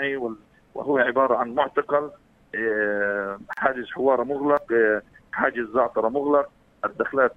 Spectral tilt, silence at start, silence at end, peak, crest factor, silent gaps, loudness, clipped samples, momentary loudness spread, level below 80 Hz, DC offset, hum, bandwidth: -7 dB/octave; 0 s; 0.05 s; -4 dBFS; 20 dB; none; -24 LUFS; under 0.1%; 12 LU; -60 dBFS; under 0.1%; none; 4.3 kHz